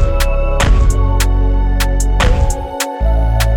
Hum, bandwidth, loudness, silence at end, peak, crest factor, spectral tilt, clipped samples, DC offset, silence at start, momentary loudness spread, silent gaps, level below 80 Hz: none; 18 kHz; -15 LUFS; 0 s; 0 dBFS; 12 dB; -5 dB/octave; under 0.1%; under 0.1%; 0 s; 4 LU; none; -12 dBFS